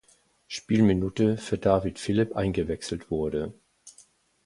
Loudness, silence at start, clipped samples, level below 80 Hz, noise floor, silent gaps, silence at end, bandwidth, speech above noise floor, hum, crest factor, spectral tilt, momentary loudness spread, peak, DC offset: -26 LUFS; 0.5 s; under 0.1%; -48 dBFS; -59 dBFS; none; 0.55 s; 11.5 kHz; 34 dB; none; 20 dB; -6.5 dB/octave; 10 LU; -6 dBFS; under 0.1%